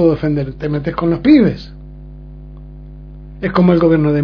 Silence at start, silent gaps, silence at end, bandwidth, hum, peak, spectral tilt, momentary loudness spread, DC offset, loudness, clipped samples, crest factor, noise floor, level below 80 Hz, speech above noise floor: 0 s; none; 0 s; 5.4 kHz; 50 Hz at -35 dBFS; 0 dBFS; -10 dB/octave; 25 LU; under 0.1%; -14 LUFS; under 0.1%; 14 dB; -33 dBFS; -34 dBFS; 20 dB